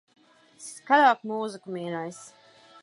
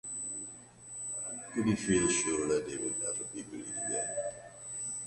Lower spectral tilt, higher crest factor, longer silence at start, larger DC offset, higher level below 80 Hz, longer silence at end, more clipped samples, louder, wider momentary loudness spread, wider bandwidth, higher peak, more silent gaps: about the same, -4 dB/octave vs -3.5 dB/octave; about the same, 20 dB vs 18 dB; first, 0.6 s vs 0.05 s; neither; second, -84 dBFS vs -60 dBFS; first, 0.55 s vs 0 s; neither; first, -25 LUFS vs -33 LUFS; first, 23 LU vs 13 LU; about the same, 11.5 kHz vs 11.5 kHz; first, -6 dBFS vs -16 dBFS; neither